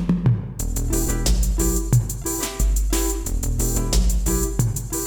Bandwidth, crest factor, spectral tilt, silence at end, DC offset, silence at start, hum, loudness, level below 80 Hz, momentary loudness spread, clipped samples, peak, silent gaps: over 20 kHz; 16 dB; -5 dB/octave; 0 s; under 0.1%; 0 s; none; -22 LUFS; -22 dBFS; 4 LU; under 0.1%; -4 dBFS; none